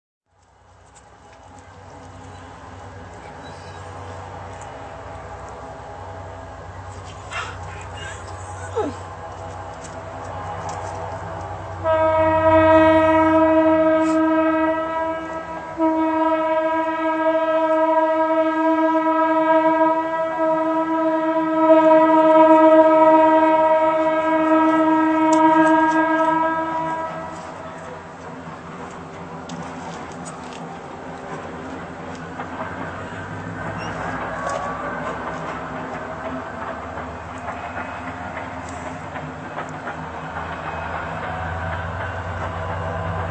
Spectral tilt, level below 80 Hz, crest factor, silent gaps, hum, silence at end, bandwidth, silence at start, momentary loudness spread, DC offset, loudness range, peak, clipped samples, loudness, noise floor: -6.5 dB/octave; -50 dBFS; 20 dB; none; none; 0 s; 8.8 kHz; 0.95 s; 21 LU; under 0.1%; 19 LU; 0 dBFS; under 0.1%; -19 LUFS; -55 dBFS